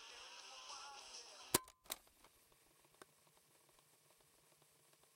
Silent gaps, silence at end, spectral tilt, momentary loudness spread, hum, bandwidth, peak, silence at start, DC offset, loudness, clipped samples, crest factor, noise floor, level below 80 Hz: none; 0.05 s; -1.5 dB/octave; 26 LU; none; 16 kHz; -16 dBFS; 0 s; under 0.1%; -46 LUFS; under 0.1%; 36 dB; -73 dBFS; -78 dBFS